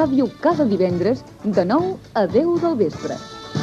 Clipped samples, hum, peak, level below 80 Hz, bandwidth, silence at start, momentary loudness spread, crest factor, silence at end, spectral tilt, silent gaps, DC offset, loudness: under 0.1%; none; -4 dBFS; -52 dBFS; 9.6 kHz; 0 s; 10 LU; 16 dB; 0 s; -7.5 dB/octave; none; under 0.1%; -20 LUFS